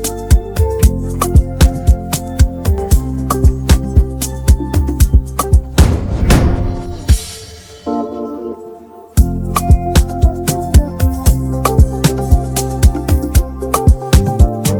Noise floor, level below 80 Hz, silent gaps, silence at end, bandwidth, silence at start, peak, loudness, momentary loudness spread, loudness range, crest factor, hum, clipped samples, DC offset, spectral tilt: -34 dBFS; -14 dBFS; none; 0 s; 19.5 kHz; 0 s; 0 dBFS; -14 LUFS; 9 LU; 4 LU; 12 dB; none; under 0.1%; under 0.1%; -6 dB/octave